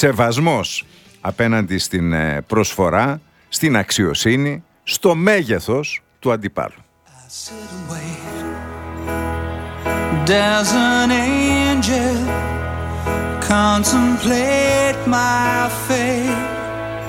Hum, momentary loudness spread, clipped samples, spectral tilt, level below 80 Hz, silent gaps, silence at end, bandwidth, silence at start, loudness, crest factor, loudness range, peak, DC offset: none; 13 LU; under 0.1%; -4.5 dB/octave; -36 dBFS; none; 0 s; 18 kHz; 0 s; -18 LUFS; 18 dB; 9 LU; 0 dBFS; under 0.1%